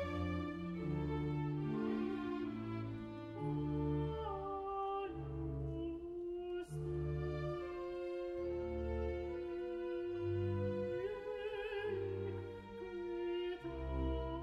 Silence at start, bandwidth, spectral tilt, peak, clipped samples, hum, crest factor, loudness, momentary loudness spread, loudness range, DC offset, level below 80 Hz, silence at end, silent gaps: 0 s; 10 kHz; -9 dB/octave; -28 dBFS; under 0.1%; none; 12 dB; -42 LUFS; 6 LU; 2 LU; under 0.1%; -52 dBFS; 0 s; none